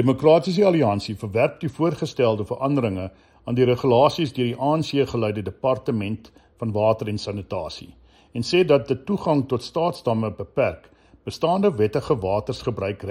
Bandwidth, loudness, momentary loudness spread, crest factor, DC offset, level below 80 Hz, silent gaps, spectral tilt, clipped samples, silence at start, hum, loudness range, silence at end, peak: 14 kHz; -22 LUFS; 12 LU; 18 dB; under 0.1%; -52 dBFS; none; -7 dB/octave; under 0.1%; 0 s; none; 3 LU; 0 s; -4 dBFS